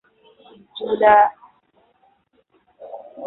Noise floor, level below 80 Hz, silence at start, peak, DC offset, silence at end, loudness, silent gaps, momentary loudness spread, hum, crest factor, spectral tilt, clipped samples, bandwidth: -62 dBFS; -60 dBFS; 0.75 s; -2 dBFS; under 0.1%; 0 s; -16 LUFS; none; 25 LU; none; 20 dB; -8 dB/octave; under 0.1%; 4.1 kHz